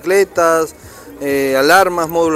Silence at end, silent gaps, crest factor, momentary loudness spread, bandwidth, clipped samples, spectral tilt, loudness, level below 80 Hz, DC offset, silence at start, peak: 0 s; none; 14 dB; 10 LU; 16 kHz; under 0.1%; -3.5 dB/octave; -13 LUFS; -48 dBFS; under 0.1%; 0.05 s; 0 dBFS